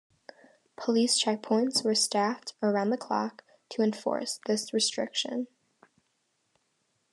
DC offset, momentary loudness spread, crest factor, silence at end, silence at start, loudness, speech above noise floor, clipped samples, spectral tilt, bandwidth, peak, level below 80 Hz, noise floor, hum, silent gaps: under 0.1%; 9 LU; 20 dB; 1.65 s; 0.8 s; -28 LUFS; 47 dB; under 0.1%; -3 dB/octave; 12.5 kHz; -12 dBFS; -90 dBFS; -76 dBFS; none; none